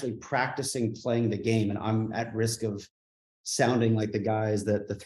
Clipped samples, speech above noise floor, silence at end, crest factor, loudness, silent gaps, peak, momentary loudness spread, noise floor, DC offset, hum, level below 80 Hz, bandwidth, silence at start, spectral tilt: under 0.1%; over 62 dB; 0 s; 18 dB; -28 LUFS; 2.90-3.44 s; -10 dBFS; 7 LU; under -90 dBFS; under 0.1%; none; -66 dBFS; 12.5 kHz; 0 s; -5.5 dB/octave